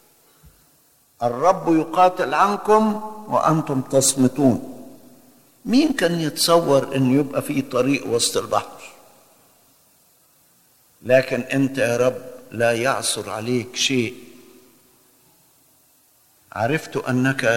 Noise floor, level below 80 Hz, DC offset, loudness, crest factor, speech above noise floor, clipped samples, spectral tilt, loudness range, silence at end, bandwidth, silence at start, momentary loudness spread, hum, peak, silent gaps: -58 dBFS; -56 dBFS; under 0.1%; -20 LUFS; 18 dB; 39 dB; under 0.1%; -4.5 dB/octave; 8 LU; 0 s; 17 kHz; 1.2 s; 10 LU; none; -4 dBFS; none